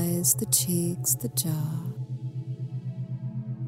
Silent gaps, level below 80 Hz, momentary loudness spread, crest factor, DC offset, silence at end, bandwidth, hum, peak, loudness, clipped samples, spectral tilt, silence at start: none; -62 dBFS; 12 LU; 22 dB; under 0.1%; 0 s; 16.5 kHz; none; -6 dBFS; -27 LUFS; under 0.1%; -4.5 dB/octave; 0 s